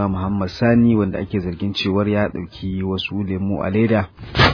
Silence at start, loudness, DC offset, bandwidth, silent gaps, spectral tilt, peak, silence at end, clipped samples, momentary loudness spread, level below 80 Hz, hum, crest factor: 0 s; -20 LUFS; under 0.1%; 5.4 kHz; none; -7.5 dB/octave; 0 dBFS; 0 s; under 0.1%; 9 LU; -40 dBFS; none; 18 dB